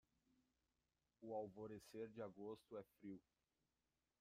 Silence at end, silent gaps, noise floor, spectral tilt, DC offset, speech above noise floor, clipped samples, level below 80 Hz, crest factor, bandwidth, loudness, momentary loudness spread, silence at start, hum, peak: 1 s; none; under -90 dBFS; -7 dB/octave; under 0.1%; over 35 dB; under 0.1%; -88 dBFS; 18 dB; 15.5 kHz; -56 LUFS; 8 LU; 1.2 s; none; -38 dBFS